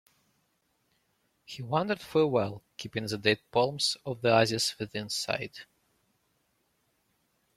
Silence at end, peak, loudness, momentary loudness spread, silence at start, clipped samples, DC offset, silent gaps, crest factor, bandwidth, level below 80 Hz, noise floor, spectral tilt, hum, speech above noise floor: 1.95 s; -10 dBFS; -29 LUFS; 16 LU; 1.5 s; under 0.1%; under 0.1%; none; 22 dB; 15.5 kHz; -68 dBFS; -75 dBFS; -4 dB/octave; none; 45 dB